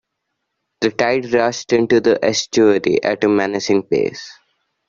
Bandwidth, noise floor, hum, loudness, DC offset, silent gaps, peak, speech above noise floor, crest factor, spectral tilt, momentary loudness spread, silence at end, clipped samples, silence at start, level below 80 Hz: 7.6 kHz; -75 dBFS; none; -17 LUFS; under 0.1%; none; 0 dBFS; 59 dB; 16 dB; -4.5 dB/octave; 7 LU; 0.55 s; under 0.1%; 0.8 s; -56 dBFS